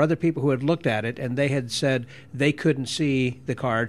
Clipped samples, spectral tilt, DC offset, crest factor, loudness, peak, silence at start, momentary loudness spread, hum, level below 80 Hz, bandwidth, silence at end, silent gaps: under 0.1%; -6 dB/octave; 0.2%; 16 dB; -24 LUFS; -8 dBFS; 0 s; 5 LU; none; -60 dBFS; 13 kHz; 0 s; none